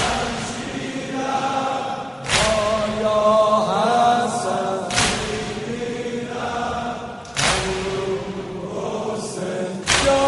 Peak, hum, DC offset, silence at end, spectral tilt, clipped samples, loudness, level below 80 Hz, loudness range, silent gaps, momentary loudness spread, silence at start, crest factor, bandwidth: -2 dBFS; none; under 0.1%; 0 s; -3.5 dB/octave; under 0.1%; -21 LUFS; -42 dBFS; 5 LU; none; 11 LU; 0 s; 20 dB; 11.5 kHz